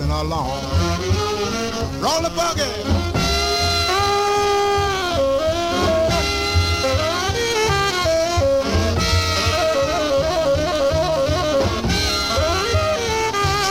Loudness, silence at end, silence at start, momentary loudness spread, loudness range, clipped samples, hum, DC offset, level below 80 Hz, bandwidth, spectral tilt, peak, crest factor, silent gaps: -19 LUFS; 0 s; 0 s; 3 LU; 1 LU; under 0.1%; none; under 0.1%; -32 dBFS; 16.5 kHz; -4 dB/octave; -6 dBFS; 12 dB; none